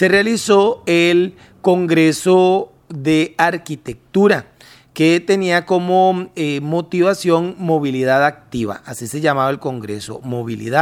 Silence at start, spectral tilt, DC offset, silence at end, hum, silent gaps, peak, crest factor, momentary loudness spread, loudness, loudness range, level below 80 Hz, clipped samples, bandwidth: 0 s; -5.5 dB/octave; under 0.1%; 0 s; none; none; 0 dBFS; 16 dB; 12 LU; -16 LUFS; 3 LU; -56 dBFS; under 0.1%; 15 kHz